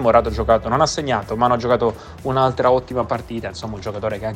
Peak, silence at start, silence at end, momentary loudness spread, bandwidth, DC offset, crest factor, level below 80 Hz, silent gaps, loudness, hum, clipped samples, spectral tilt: 0 dBFS; 0 s; 0 s; 12 LU; 14.5 kHz; under 0.1%; 18 dB; -36 dBFS; none; -20 LUFS; none; under 0.1%; -5.5 dB/octave